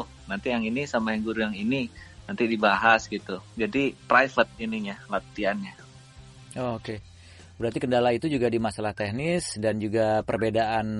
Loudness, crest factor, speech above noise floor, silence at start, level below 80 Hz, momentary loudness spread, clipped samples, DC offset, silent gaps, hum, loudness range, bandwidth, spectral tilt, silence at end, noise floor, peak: -26 LUFS; 20 dB; 23 dB; 0 s; -54 dBFS; 13 LU; under 0.1%; under 0.1%; none; none; 6 LU; 11.5 kHz; -5.5 dB/octave; 0 s; -49 dBFS; -6 dBFS